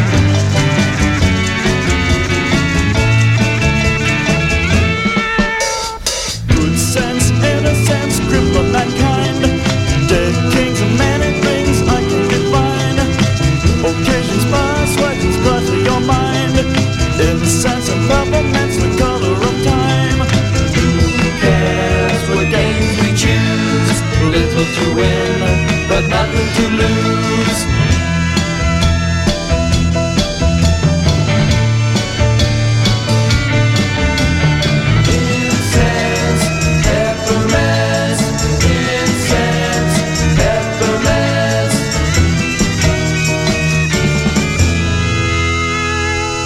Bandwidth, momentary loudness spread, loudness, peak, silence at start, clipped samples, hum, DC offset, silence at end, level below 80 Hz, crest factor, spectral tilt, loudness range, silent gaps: 15.5 kHz; 2 LU; -13 LUFS; 0 dBFS; 0 s; under 0.1%; none; under 0.1%; 0 s; -24 dBFS; 12 dB; -5 dB/octave; 1 LU; none